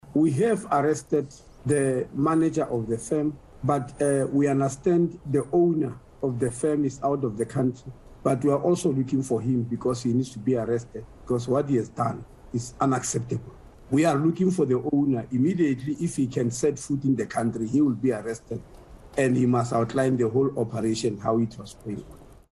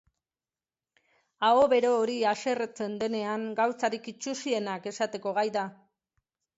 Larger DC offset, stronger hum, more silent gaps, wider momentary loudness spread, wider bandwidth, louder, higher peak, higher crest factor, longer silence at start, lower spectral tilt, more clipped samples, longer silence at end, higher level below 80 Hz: neither; neither; neither; about the same, 10 LU vs 11 LU; first, 12 kHz vs 8 kHz; first, -25 LUFS vs -28 LUFS; first, -8 dBFS vs -12 dBFS; about the same, 16 dB vs 18 dB; second, 0.05 s vs 1.4 s; first, -7 dB/octave vs -4 dB/octave; neither; second, 0.2 s vs 0.85 s; first, -54 dBFS vs -74 dBFS